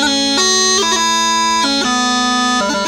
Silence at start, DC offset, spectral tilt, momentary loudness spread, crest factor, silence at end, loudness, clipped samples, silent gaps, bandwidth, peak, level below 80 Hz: 0 s; under 0.1%; -0.5 dB/octave; 3 LU; 12 dB; 0 s; -12 LUFS; under 0.1%; none; 18.5 kHz; -2 dBFS; -46 dBFS